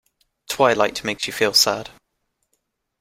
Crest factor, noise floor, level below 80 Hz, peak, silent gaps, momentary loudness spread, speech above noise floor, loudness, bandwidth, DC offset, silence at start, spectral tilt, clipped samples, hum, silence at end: 20 dB; -74 dBFS; -58 dBFS; -2 dBFS; none; 14 LU; 54 dB; -19 LUFS; 16 kHz; under 0.1%; 0.5 s; -2 dB/octave; under 0.1%; none; 1.1 s